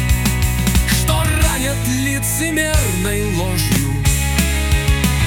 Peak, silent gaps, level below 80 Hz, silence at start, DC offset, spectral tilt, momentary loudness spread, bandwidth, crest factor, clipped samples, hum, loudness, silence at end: -2 dBFS; none; -20 dBFS; 0 s; under 0.1%; -4 dB/octave; 3 LU; 18 kHz; 14 dB; under 0.1%; none; -16 LUFS; 0 s